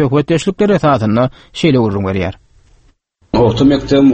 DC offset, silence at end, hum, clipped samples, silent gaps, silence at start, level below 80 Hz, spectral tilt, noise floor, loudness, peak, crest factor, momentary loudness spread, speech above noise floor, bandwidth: under 0.1%; 0 s; none; under 0.1%; none; 0 s; -36 dBFS; -7 dB/octave; -53 dBFS; -13 LUFS; 0 dBFS; 12 dB; 8 LU; 41 dB; 8.8 kHz